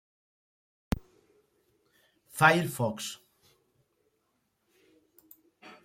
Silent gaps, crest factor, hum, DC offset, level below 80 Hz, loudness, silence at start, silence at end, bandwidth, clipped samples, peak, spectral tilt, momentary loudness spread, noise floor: none; 28 dB; none; under 0.1%; -52 dBFS; -28 LUFS; 0.9 s; 0.15 s; 16.5 kHz; under 0.1%; -8 dBFS; -4.5 dB/octave; 19 LU; -77 dBFS